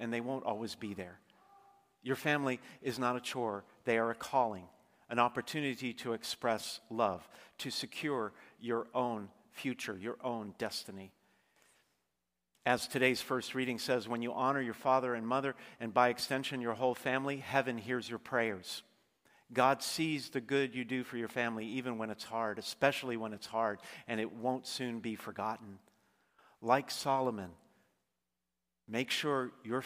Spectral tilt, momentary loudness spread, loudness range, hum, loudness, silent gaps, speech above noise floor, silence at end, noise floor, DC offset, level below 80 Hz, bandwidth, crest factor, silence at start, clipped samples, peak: -4.5 dB/octave; 11 LU; 5 LU; none; -36 LUFS; none; 53 dB; 0 s; -89 dBFS; under 0.1%; -78 dBFS; 15.5 kHz; 26 dB; 0 s; under 0.1%; -12 dBFS